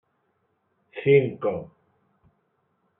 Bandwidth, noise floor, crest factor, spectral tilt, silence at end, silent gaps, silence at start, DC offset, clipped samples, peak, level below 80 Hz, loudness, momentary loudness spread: 3.8 kHz; -72 dBFS; 22 dB; -6.5 dB/octave; 1.35 s; none; 0.95 s; under 0.1%; under 0.1%; -6 dBFS; -70 dBFS; -23 LUFS; 16 LU